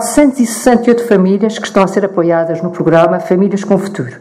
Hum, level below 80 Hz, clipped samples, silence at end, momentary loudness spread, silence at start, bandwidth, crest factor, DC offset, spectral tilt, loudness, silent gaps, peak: none; -44 dBFS; 0.2%; 0 s; 5 LU; 0 s; 15.5 kHz; 12 dB; under 0.1%; -6 dB/octave; -12 LUFS; none; 0 dBFS